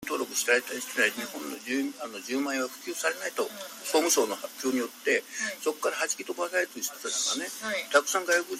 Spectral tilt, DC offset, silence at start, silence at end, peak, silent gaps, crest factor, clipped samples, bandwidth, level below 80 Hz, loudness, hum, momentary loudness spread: -0.5 dB/octave; under 0.1%; 0 s; 0 s; -8 dBFS; none; 22 dB; under 0.1%; 16 kHz; -78 dBFS; -29 LUFS; none; 8 LU